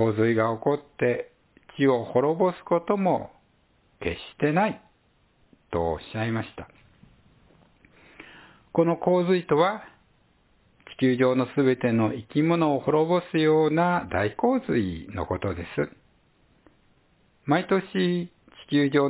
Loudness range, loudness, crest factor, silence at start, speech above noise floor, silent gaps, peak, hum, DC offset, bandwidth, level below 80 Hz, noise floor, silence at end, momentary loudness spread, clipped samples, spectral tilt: 8 LU; -25 LUFS; 18 dB; 0 s; 41 dB; none; -8 dBFS; none; under 0.1%; 4 kHz; -52 dBFS; -64 dBFS; 0 s; 11 LU; under 0.1%; -11 dB/octave